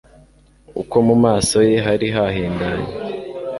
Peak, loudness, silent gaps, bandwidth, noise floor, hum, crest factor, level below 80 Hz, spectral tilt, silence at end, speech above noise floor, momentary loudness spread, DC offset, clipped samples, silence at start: -2 dBFS; -17 LUFS; none; 11.5 kHz; -50 dBFS; none; 16 dB; -42 dBFS; -5.5 dB/octave; 0 s; 33 dB; 14 LU; under 0.1%; under 0.1%; 0.7 s